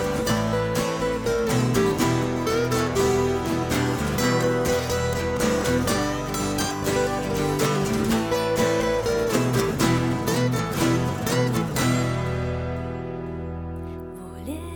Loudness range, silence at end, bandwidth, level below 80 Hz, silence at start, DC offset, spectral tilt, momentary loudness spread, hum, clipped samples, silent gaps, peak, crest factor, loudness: 2 LU; 0 s; 19 kHz; -40 dBFS; 0 s; under 0.1%; -5 dB/octave; 10 LU; none; under 0.1%; none; -8 dBFS; 16 dB; -23 LUFS